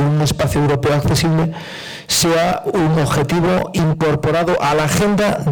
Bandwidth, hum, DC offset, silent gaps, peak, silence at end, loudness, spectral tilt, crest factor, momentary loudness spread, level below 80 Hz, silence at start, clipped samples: 19.5 kHz; none; under 0.1%; none; -8 dBFS; 0 s; -16 LUFS; -5 dB/octave; 6 dB; 3 LU; -38 dBFS; 0 s; under 0.1%